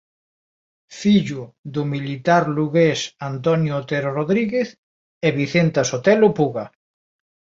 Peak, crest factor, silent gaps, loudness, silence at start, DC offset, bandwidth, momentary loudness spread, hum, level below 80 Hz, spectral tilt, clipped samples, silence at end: -2 dBFS; 18 dB; 1.58-1.64 s, 4.78-5.21 s; -20 LUFS; 0.9 s; under 0.1%; 7.8 kHz; 11 LU; none; -60 dBFS; -6 dB/octave; under 0.1%; 0.9 s